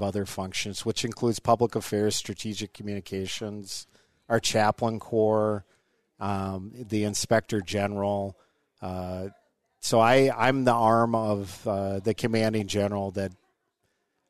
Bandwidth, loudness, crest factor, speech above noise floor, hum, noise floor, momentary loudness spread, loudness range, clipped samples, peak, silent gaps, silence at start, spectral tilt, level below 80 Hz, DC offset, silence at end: 13.5 kHz; -27 LUFS; 20 dB; 49 dB; none; -75 dBFS; 14 LU; 5 LU; under 0.1%; -6 dBFS; none; 0 s; -5 dB/octave; -58 dBFS; 0.2%; 0.95 s